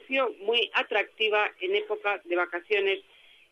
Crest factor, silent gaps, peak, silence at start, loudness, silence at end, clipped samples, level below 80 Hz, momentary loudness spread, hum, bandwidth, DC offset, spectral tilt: 16 dB; none; -12 dBFS; 0.1 s; -27 LUFS; 0.5 s; under 0.1%; -80 dBFS; 5 LU; none; 7 kHz; under 0.1%; -3 dB/octave